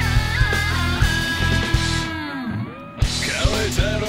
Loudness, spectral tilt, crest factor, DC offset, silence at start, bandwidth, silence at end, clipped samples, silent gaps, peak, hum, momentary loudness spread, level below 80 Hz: -21 LUFS; -4 dB/octave; 14 dB; under 0.1%; 0 s; 16 kHz; 0 s; under 0.1%; none; -6 dBFS; none; 8 LU; -26 dBFS